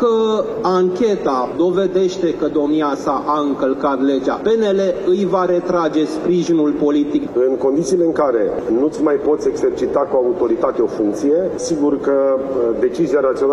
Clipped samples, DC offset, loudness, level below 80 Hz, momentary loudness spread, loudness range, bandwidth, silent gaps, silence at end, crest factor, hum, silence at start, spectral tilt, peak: under 0.1%; under 0.1%; -17 LUFS; -50 dBFS; 3 LU; 1 LU; 11 kHz; none; 0 s; 12 dB; none; 0 s; -6 dB/octave; -4 dBFS